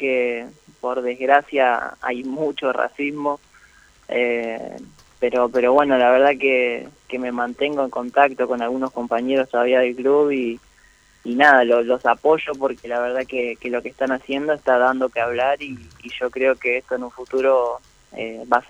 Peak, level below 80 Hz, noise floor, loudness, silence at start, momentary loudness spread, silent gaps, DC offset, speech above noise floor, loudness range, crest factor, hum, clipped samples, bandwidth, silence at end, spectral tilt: -2 dBFS; -58 dBFS; -53 dBFS; -20 LUFS; 0 s; 15 LU; none; under 0.1%; 34 dB; 4 LU; 18 dB; none; under 0.1%; 9.8 kHz; 0.1 s; -5 dB/octave